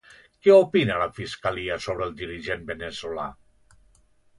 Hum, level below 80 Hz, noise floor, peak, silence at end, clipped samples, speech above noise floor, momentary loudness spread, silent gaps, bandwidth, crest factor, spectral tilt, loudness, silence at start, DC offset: none; -52 dBFS; -60 dBFS; -4 dBFS; 1.05 s; under 0.1%; 36 dB; 16 LU; none; 11 kHz; 20 dB; -6 dB/octave; -24 LUFS; 0.45 s; under 0.1%